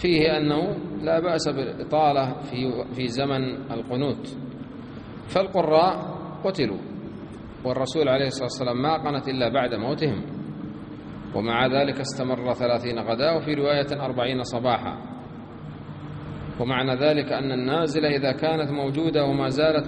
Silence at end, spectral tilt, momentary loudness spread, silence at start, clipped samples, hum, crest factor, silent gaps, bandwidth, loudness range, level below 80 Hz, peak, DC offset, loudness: 0 s; -6 dB/octave; 16 LU; 0 s; under 0.1%; none; 18 dB; none; 10 kHz; 3 LU; -52 dBFS; -6 dBFS; under 0.1%; -24 LUFS